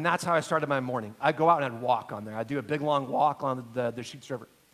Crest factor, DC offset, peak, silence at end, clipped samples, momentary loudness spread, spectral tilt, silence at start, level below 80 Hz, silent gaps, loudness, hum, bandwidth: 20 dB; under 0.1%; -8 dBFS; 0.3 s; under 0.1%; 13 LU; -5.5 dB/octave; 0 s; -70 dBFS; none; -28 LUFS; none; 15.5 kHz